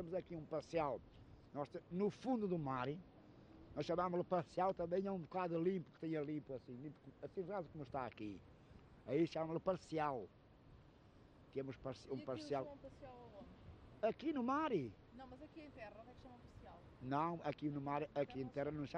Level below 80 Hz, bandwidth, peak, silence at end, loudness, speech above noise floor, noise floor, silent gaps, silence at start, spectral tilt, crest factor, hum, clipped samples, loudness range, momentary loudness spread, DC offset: -70 dBFS; 9.6 kHz; -26 dBFS; 0 s; -44 LUFS; 22 dB; -65 dBFS; none; 0 s; -7.5 dB/octave; 18 dB; none; under 0.1%; 6 LU; 20 LU; under 0.1%